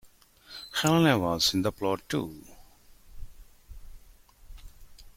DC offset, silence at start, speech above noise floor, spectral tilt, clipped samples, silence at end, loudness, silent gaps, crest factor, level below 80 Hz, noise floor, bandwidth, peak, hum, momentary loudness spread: under 0.1%; 0.5 s; 30 dB; -4.5 dB/octave; under 0.1%; 0.05 s; -26 LUFS; none; 22 dB; -50 dBFS; -56 dBFS; 16.5 kHz; -8 dBFS; none; 21 LU